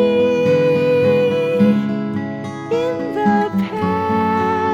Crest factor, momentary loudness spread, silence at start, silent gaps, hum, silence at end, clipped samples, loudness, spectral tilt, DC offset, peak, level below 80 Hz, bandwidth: 12 dB; 7 LU; 0 s; none; none; 0 s; under 0.1%; -17 LUFS; -7.5 dB/octave; under 0.1%; -4 dBFS; -54 dBFS; 12 kHz